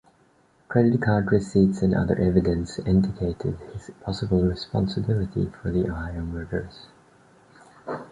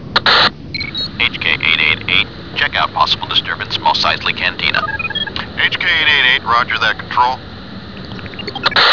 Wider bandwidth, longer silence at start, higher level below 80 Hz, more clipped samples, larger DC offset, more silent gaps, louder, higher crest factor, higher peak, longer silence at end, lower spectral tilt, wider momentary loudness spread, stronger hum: first, 10 kHz vs 5.4 kHz; first, 0.7 s vs 0 s; about the same, -40 dBFS vs -40 dBFS; neither; second, under 0.1% vs 1%; neither; second, -24 LUFS vs -13 LUFS; about the same, 20 dB vs 16 dB; second, -4 dBFS vs 0 dBFS; about the same, 0.05 s vs 0 s; first, -8 dB/octave vs -3.5 dB/octave; about the same, 14 LU vs 15 LU; neither